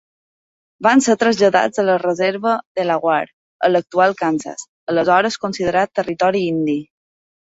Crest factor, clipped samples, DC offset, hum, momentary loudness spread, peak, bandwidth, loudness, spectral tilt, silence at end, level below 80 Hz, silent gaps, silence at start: 16 dB; under 0.1%; under 0.1%; none; 7 LU; -2 dBFS; 8 kHz; -17 LUFS; -4.5 dB/octave; 0.65 s; -58 dBFS; 2.66-2.75 s, 3.33-3.60 s, 4.68-4.87 s; 0.8 s